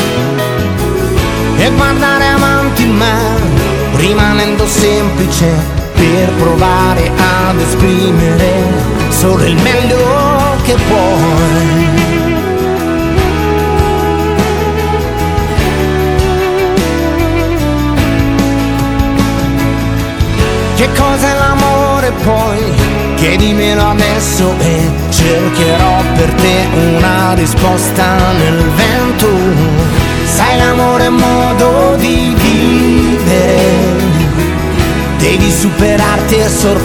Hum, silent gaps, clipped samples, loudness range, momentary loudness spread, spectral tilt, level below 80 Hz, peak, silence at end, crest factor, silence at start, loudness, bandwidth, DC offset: none; none; 0.4%; 3 LU; 4 LU; -5.5 dB/octave; -20 dBFS; 0 dBFS; 0 s; 10 dB; 0 s; -10 LUFS; 19 kHz; under 0.1%